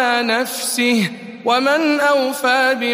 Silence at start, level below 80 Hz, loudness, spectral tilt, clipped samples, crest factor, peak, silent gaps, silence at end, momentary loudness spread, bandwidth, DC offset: 0 s; -70 dBFS; -16 LUFS; -3 dB/octave; under 0.1%; 14 dB; -2 dBFS; none; 0 s; 4 LU; 15.5 kHz; under 0.1%